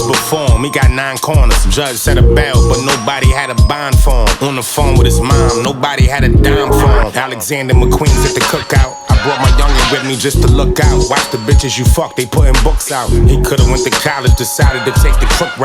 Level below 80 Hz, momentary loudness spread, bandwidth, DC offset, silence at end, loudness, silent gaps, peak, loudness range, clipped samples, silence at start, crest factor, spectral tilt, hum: -12 dBFS; 4 LU; 18 kHz; under 0.1%; 0 s; -11 LUFS; none; 0 dBFS; 1 LU; under 0.1%; 0 s; 10 dB; -4.5 dB/octave; none